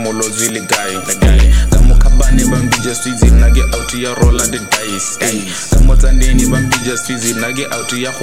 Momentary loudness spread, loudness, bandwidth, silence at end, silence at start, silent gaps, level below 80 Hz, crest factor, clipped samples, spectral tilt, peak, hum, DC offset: 7 LU; -13 LUFS; 16 kHz; 0 s; 0 s; none; -12 dBFS; 10 dB; under 0.1%; -4 dB/octave; 0 dBFS; none; 1%